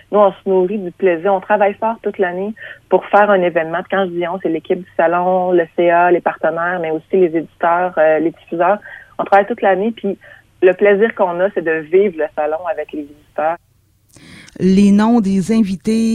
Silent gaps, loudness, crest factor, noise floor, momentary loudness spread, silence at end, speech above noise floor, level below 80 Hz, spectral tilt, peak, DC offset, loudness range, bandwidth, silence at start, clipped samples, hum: none; -15 LUFS; 16 dB; -51 dBFS; 9 LU; 0 s; 36 dB; -52 dBFS; -7 dB/octave; 0 dBFS; under 0.1%; 2 LU; 11 kHz; 0.1 s; under 0.1%; none